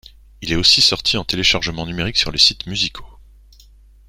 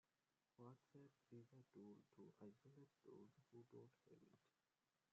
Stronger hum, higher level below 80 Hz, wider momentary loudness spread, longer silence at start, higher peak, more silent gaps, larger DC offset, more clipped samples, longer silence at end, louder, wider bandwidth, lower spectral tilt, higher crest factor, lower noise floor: first, 50 Hz at -40 dBFS vs none; first, -38 dBFS vs under -90 dBFS; first, 12 LU vs 3 LU; second, 0.4 s vs 0.6 s; first, 0 dBFS vs -50 dBFS; neither; neither; neither; first, 0.95 s vs 0.65 s; first, -15 LUFS vs -68 LUFS; first, 16.5 kHz vs 7 kHz; second, -2.5 dB/octave vs -8 dB/octave; about the same, 20 dB vs 18 dB; second, -46 dBFS vs under -90 dBFS